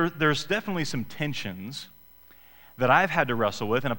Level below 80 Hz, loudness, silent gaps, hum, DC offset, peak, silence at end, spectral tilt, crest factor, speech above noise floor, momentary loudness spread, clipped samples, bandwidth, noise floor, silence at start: -54 dBFS; -26 LUFS; none; none; 0.5%; -6 dBFS; 0 s; -5 dB/octave; 22 dB; 28 dB; 16 LU; under 0.1%; 17 kHz; -54 dBFS; 0 s